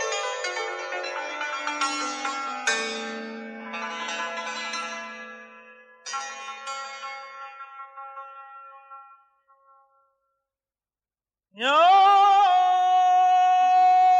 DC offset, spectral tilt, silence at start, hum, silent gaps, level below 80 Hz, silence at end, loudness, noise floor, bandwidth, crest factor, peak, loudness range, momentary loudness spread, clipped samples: under 0.1%; -0.5 dB/octave; 0 s; none; none; under -90 dBFS; 0 s; -23 LUFS; under -90 dBFS; 9.8 kHz; 16 dB; -8 dBFS; 21 LU; 23 LU; under 0.1%